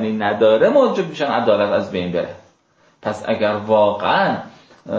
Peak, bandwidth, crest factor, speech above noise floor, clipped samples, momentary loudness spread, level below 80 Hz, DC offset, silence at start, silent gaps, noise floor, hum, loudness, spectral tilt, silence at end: -2 dBFS; 8 kHz; 16 dB; 40 dB; under 0.1%; 12 LU; -54 dBFS; under 0.1%; 0 s; none; -57 dBFS; none; -17 LUFS; -6.5 dB/octave; 0 s